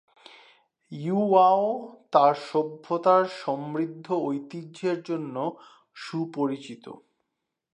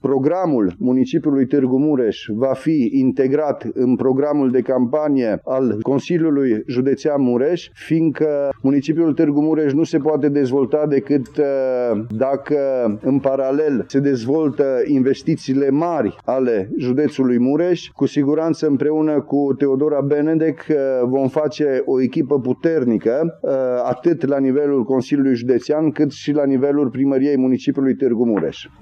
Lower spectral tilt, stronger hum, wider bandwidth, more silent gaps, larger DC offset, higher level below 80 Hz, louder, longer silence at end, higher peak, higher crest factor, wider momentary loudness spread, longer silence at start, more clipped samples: about the same, -7 dB/octave vs -8 dB/octave; neither; first, 10 kHz vs 7 kHz; neither; neither; second, -82 dBFS vs -60 dBFS; second, -26 LUFS vs -18 LUFS; first, 0.8 s vs 0.15 s; about the same, -6 dBFS vs -4 dBFS; first, 20 dB vs 14 dB; first, 16 LU vs 4 LU; first, 0.9 s vs 0.05 s; neither